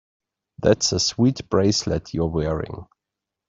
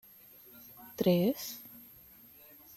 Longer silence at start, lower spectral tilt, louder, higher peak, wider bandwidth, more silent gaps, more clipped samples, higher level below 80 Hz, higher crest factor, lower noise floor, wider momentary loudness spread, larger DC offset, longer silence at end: about the same, 0.6 s vs 0.55 s; second, -4.5 dB/octave vs -6.5 dB/octave; first, -21 LUFS vs -31 LUFS; first, -2 dBFS vs -16 dBFS; second, 7.8 kHz vs 16 kHz; neither; neither; first, -44 dBFS vs -72 dBFS; about the same, 20 dB vs 20 dB; first, -85 dBFS vs -57 dBFS; second, 9 LU vs 25 LU; neither; second, 0.65 s vs 0.95 s